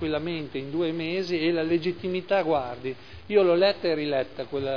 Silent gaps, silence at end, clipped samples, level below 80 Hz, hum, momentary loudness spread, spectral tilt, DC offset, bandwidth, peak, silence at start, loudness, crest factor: none; 0 s; under 0.1%; -58 dBFS; none; 11 LU; -7 dB/octave; 0.4%; 5.4 kHz; -8 dBFS; 0 s; -26 LUFS; 16 dB